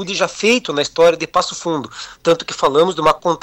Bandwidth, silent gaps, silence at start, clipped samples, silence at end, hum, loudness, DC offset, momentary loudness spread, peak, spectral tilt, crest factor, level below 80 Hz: 13 kHz; none; 0 s; under 0.1%; 0.05 s; none; -16 LUFS; under 0.1%; 9 LU; -4 dBFS; -3.5 dB/octave; 12 dB; -50 dBFS